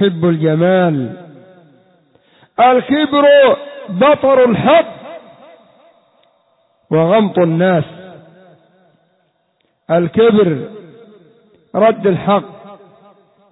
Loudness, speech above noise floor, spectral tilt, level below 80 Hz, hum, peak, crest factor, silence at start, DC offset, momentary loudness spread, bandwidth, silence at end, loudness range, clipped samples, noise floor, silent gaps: -12 LUFS; 51 dB; -10.5 dB/octave; -56 dBFS; none; -2 dBFS; 14 dB; 0 s; under 0.1%; 16 LU; 4.1 kHz; 0.75 s; 6 LU; under 0.1%; -63 dBFS; none